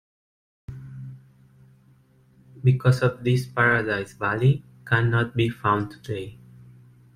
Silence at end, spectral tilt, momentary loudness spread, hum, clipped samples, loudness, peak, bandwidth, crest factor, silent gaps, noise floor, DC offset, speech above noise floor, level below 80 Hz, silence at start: 0.8 s; -7.5 dB/octave; 20 LU; none; under 0.1%; -23 LUFS; -6 dBFS; 10.5 kHz; 20 dB; none; -57 dBFS; under 0.1%; 35 dB; -54 dBFS; 0.7 s